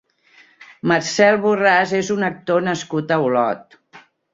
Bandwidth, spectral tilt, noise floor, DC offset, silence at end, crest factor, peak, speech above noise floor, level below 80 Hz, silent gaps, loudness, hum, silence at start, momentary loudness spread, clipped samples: 7.8 kHz; -4.5 dB/octave; -52 dBFS; under 0.1%; 0.35 s; 18 dB; -2 dBFS; 35 dB; -64 dBFS; none; -18 LUFS; none; 0.6 s; 8 LU; under 0.1%